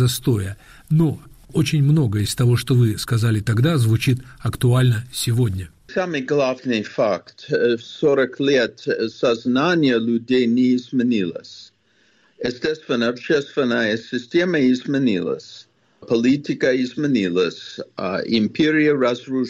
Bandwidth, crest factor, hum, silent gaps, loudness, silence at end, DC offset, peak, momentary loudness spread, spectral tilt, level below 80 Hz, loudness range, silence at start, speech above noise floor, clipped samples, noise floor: 15 kHz; 12 dB; none; none; -20 LUFS; 0 s; under 0.1%; -8 dBFS; 9 LU; -6.5 dB/octave; -50 dBFS; 3 LU; 0 s; 41 dB; under 0.1%; -60 dBFS